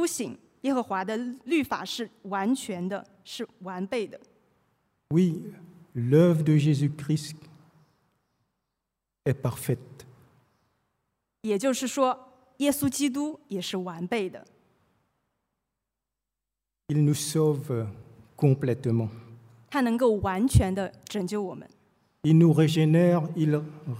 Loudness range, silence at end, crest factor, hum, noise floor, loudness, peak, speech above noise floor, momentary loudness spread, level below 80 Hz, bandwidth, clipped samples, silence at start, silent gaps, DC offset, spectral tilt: 11 LU; 0 s; 20 dB; none; -88 dBFS; -26 LUFS; -6 dBFS; 62 dB; 16 LU; -50 dBFS; 16 kHz; under 0.1%; 0 s; none; under 0.1%; -6.5 dB/octave